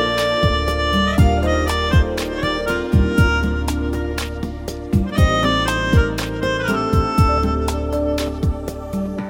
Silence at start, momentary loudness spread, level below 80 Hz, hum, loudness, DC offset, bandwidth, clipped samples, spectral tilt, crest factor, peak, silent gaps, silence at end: 0 s; 9 LU; -24 dBFS; none; -19 LUFS; under 0.1%; 17 kHz; under 0.1%; -6 dB/octave; 16 dB; -2 dBFS; none; 0 s